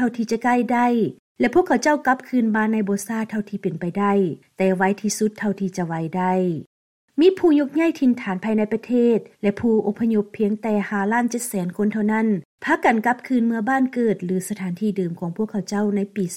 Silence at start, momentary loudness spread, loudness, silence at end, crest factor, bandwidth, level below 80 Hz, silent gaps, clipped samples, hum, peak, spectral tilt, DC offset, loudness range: 0 s; 7 LU; -21 LUFS; 0 s; 16 dB; 16 kHz; -62 dBFS; 1.19-1.35 s, 6.66-7.08 s, 12.45-12.58 s; under 0.1%; none; -4 dBFS; -6 dB/octave; under 0.1%; 2 LU